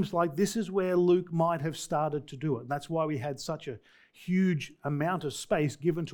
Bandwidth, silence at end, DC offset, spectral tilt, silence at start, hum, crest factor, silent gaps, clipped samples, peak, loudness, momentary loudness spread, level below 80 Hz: 18.5 kHz; 0 s; under 0.1%; -6.5 dB/octave; 0 s; none; 16 dB; none; under 0.1%; -12 dBFS; -30 LUFS; 9 LU; -64 dBFS